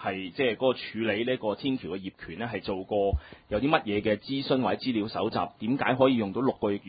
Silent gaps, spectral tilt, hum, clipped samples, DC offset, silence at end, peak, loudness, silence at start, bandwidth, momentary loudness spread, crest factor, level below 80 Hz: none; -10 dB/octave; none; under 0.1%; under 0.1%; 0 s; -8 dBFS; -28 LUFS; 0 s; 5 kHz; 9 LU; 20 dB; -46 dBFS